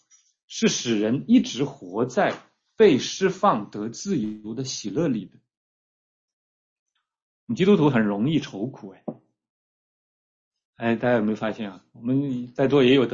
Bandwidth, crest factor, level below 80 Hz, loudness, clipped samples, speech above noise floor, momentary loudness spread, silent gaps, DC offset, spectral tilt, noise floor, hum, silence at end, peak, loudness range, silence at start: 7.8 kHz; 18 dB; -62 dBFS; -23 LUFS; under 0.1%; over 67 dB; 15 LU; 5.57-6.86 s, 7.22-7.47 s, 9.50-10.51 s, 10.65-10.73 s; under 0.1%; -5.5 dB/octave; under -90 dBFS; none; 0 s; -6 dBFS; 8 LU; 0.5 s